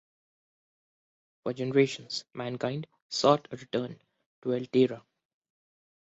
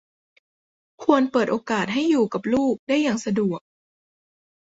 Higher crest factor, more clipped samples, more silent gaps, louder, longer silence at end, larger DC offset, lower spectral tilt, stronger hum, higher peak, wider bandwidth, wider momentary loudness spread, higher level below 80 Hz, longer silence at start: about the same, 24 dB vs 22 dB; neither; first, 3.02-3.10 s, 4.26-4.42 s vs 2.79-2.87 s; second, -30 LUFS vs -22 LUFS; about the same, 1.1 s vs 1.1 s; neither; about the same, -5.5 dB/octave vs -5.5 dB/octave; neither; second, -8 dBFS vs -2 dBFS; about the same, 8 kHz vs 8 kHz; first, 14 LU vs 5 LU; second, -72 dBFS vs -62 dBFS; first, 1.45 s vs 1 s